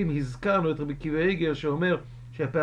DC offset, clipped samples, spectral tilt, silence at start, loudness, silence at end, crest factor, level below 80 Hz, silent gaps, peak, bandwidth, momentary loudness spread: under 0.1%; under 0.1%; -7.5 dB/octave; 0 s; -27 LUFS; 0 s; 16 dB; -48 dBFS; none; -10 dBFS; 10 kHz; 6 LU